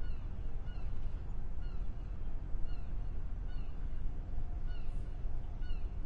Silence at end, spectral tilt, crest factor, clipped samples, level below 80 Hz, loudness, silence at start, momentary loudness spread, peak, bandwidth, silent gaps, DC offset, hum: 0 s; -8 dB/octave; 12 dB; under 0.1%; -38 dBFS; -45 LUFS; 0 s; 1 LU; -22 dBFS; 4.3 kHz; none; under 0.1%; none